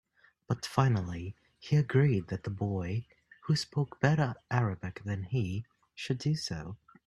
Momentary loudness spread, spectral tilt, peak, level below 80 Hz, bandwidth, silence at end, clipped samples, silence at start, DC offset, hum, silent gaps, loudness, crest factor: 14 LU; -6.5 dB/octave; -10 dBFS; -60 dBFS; 12 kHz; 0.3 s; under 0.1%; 0.5 s; under 0.1%; none; none; -32 LUFS; 22 dB